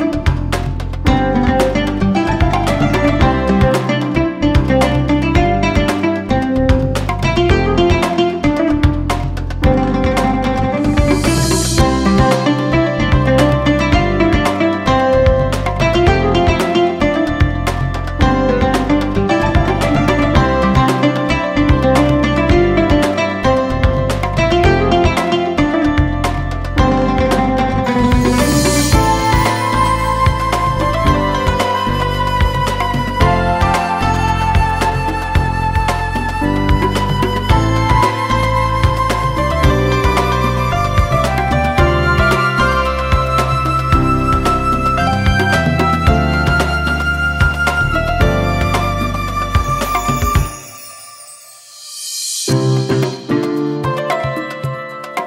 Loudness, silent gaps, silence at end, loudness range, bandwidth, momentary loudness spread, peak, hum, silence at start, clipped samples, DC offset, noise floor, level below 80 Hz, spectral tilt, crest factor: -14 LUFS; none; 0 s; 3 LU; 16.5 kHz; 5 LU; 0 dBFS; none; 0 s; under 0.1%; under 0.1%; -37 dBFS; -22 dBFS; -6 dB/octave; 14 dB